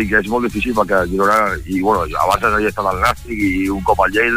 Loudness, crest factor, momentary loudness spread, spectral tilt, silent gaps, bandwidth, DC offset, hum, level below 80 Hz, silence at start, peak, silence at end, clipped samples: -16 LUFS; 14 dB; 5 LU; -5.5 dB/octave; none; 16 kHz; under 0.1%; none; -32 dBFS; 0 s; -2 dBFS; 0 s; under 0.1%